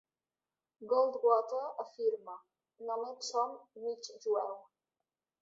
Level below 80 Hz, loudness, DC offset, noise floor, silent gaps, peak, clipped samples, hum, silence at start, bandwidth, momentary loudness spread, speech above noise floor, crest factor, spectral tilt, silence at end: under -90 dBFS; -35 LUFS; under 0.1%; under -90 dBFS; none; -16 dBFS; under 0.1%; none; 0.8 s; 7.6 kHz; 18 LU; over 55 dB; 22 dB; -1.5 dB/octave; 0.8 s